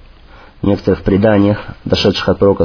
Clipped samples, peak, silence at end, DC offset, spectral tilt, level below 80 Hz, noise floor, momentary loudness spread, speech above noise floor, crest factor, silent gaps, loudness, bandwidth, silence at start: under 0.1%; 0 dBFS; 0 s; under 0.1%; -7 dB/octave; -34 dBFS; -39 dBFS; 7 LU; 27 dB; 12 dB; none; -14 LUFS; 5.4 kHz; 0.35 s